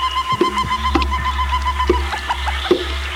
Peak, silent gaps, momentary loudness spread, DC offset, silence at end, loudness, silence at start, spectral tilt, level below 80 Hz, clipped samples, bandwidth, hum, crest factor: -2 dBFS; none; 3 LU; under 0.1%; 0 s; -19 LUFS; 0 s; -5 dB/octave; -24 dBFS; under 0.1%; 15.5 kHz; none; 18 dB